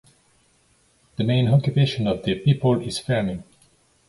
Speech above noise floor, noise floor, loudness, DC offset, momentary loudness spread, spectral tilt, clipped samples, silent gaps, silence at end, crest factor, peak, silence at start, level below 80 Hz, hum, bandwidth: 41 dB; -61 dBFS; -22 LUFS; under 0.1%; 10 LU; -7 dB/octave; under 0.1%; none; 0.65 s; 16 dB; -6 dBFS; 1.2 s; -50 dBFS; none; 11.5 kHz